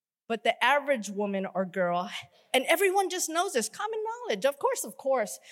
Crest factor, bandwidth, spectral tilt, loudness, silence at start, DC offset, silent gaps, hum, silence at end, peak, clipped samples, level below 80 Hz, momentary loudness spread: 18 dB; 16.5 kHz; -3 dB/octave; -28 LUFS; 0.3 s; under 0.1%; none; none; 0 s; -10 dBFS; under 0.1%; -90 dBFS; 9 LU